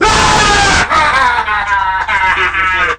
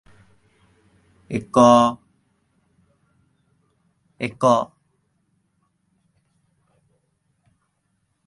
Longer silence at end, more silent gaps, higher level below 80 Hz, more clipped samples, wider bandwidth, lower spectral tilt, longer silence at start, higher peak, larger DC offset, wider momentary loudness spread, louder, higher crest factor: second, 0 s vs 3.6 s; neither; first, -26 dBFS vs -62 dBFS; first, 0.1% vs under 0.1%; first, 16 kHz vs 11.5 kHz; second, -2 dB/octave vs -6 dB/octave; second, 0 s vs 1.3 s; about the same, 0 dBFS vs 0 dBFS; neither; second, 5 LU vs 18 LU; first, -10 LUFS vs -18 LUFS; second, 10 dB vs 24 dB